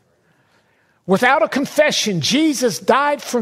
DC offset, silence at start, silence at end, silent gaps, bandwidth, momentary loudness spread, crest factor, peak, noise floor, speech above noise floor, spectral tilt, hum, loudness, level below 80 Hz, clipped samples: under 0.1%; 1.05 s; 0 s; none; 16 kHz; 4 LU; 16 dB; -2 dBFS; -59 dBFS; 43 dB; -3.5 dB/octave; none; -16 LUFS; -62 dBFS; under 0.1%